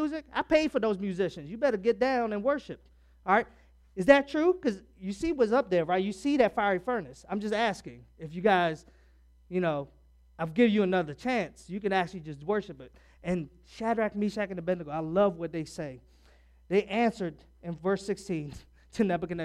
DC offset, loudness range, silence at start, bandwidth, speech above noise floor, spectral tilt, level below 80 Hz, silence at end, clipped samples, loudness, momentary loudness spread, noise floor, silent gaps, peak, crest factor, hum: under 0.1%; 5 LU; 0 s; 12 kHz; 31 dB; -6.5 dB/octave; -58 dBFS; 0 s; under 0.1%; -29 LUFS; 16 LU; -59 dBFS; none; -6 dBFS; 24 dB; none